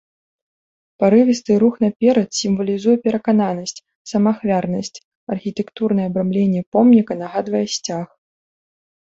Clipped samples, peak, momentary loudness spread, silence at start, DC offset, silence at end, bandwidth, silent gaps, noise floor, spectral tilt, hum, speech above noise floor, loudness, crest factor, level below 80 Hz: under 0.1%; -2 dBFS; 13 LU; 1 s; under 0.1%; 1 s; 7.8 kHz; 1.96-2.00 s, 3.95-4.05 s, 5.04-5.27 s, 6.66-6.72 s; under -90 dBFS; -6 dB/octave; none; over 73 dB; -18 LUFS; 16 dB; -60 dBFS